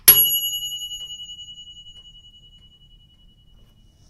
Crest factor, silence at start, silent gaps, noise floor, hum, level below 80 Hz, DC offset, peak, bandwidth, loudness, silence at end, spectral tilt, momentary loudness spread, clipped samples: 24 dB; 0.05 s; none; -53 dBFS; none; -54 dBFS; under 0.1%; 0 dBFS; 16 kHz; -18 LUFS; 2.1 s; 1.5 dB/octave; 28 LU; under 0.1%